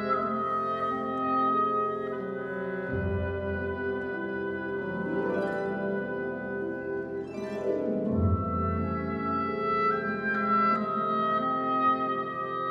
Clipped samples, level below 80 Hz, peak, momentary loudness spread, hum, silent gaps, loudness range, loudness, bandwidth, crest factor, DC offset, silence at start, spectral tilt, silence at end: under 0.1%; -50 dBFS; -14 dBFS; 8 LU; none; none; 5 LU; -29 LUFS; 7.2 kHz; 14 dB; under 0.1%; 0 s; -8.5 dB/octave; 0 s